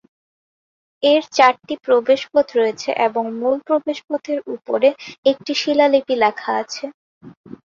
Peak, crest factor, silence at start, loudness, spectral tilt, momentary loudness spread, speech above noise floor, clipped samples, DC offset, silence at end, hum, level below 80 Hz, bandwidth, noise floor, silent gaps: -2 dBFS; 18 dB; 1 s; -18 LUFS; -3 dB/octave; 10 LU; over 72 dB; under 0.1%; under 0.1%; 0.2 s; none; -66 dBFS; 7.4 kHz; under -90 dBFS; 5.18-5.23 s, 6.94-7.21 s, 7.37-7.44 s